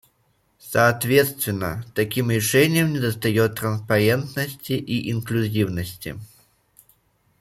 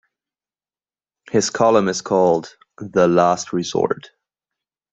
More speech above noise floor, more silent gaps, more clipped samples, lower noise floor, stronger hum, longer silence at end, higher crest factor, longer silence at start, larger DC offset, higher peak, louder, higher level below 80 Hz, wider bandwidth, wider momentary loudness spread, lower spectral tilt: second, 44 dB vs over 73 dB; neither; neither; second, -65 dBFS vs under -90 dBFS; neither; first, 1.15 s vs 0.85 s; about the same, 20 dB vs 18 dB; second, 0.65 s vs 1.35 s; neither; about the same, -4 dBFS vs -2 dBFS; second, -22 LUFS vs -18 LUFS; first, -54 dBFS vs -60 dBFS; first, 16.5 kHz vs 8.2 kHz; about the same, 10 LU vs 8 LU; about the same, -5 dB/octave vs -5 dB/octave